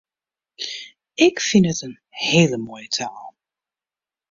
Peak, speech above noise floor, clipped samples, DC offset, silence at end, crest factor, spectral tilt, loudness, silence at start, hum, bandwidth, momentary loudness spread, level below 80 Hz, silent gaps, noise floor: -2 dBFS; over 71 dB; under 0.1%; under 0.1%; 1 s; 20 dB; -4.5 dB/octave; -20 LUFS; 0.6 s; none; 7.6 kHz; 18 LU; -60 dBFS; none; under -90 dBFS